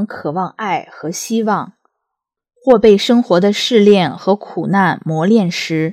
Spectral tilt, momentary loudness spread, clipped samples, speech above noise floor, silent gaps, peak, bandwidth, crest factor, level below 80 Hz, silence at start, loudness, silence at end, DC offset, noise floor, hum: -5.5 dB/octave; 11 LU; 0.2%; 65 dB; none; 0 dBFS; 15.5 kHz; 14 dB; -54 dBFS; 0 s; -14 LUFS; 0 s; under 0.1%; -79 dBFS; none